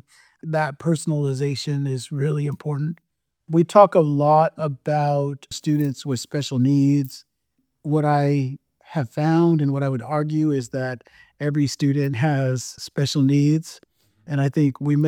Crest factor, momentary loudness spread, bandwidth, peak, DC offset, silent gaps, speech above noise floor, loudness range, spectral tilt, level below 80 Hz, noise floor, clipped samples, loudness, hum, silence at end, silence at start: 20 dB; 11 LU; 15.5 kHz; 0 dBFS; under 0.1%; none; 53 dB; 4 LU; -7 dB/octave; -66 dBFS; -73 dBFS; under 0.1%; -21 LUFS; none; 0 s; 0.45 s